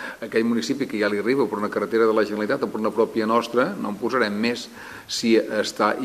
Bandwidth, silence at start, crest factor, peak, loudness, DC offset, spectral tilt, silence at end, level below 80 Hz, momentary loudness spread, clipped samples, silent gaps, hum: 14.5 kHz; 0 s; 18 dB; -4 dBFS; -23 LUFS; under 0.1%; -4.5 dB/octave; 0 s; -64 dBFS; 6 LU; under 0.1%; none; none